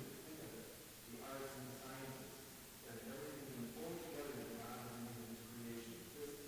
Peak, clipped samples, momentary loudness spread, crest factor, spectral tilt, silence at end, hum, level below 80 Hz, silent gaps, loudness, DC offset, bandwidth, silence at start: -36 dBFS; under 0.1%; 5 LU; 16 dB; -4 dB/octave; 0 s; none; -72 dBFS; none; -51 LUFS; under 0.1%; 16 kHz; 0 s